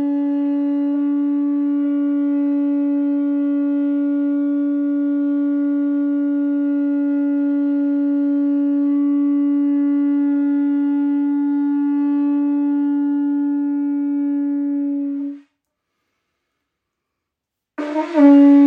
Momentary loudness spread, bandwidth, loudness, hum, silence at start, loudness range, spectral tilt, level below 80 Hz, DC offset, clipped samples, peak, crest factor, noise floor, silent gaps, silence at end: 3 LU; 3.3 kHz; -18 LUFS; none; 0 s; 6 LU; -7.5 dB/octave; -82 dBFS; under 0.1%; under 0.1%; -2 dBFS; 16 dB; -82 dBFS; none; 0 s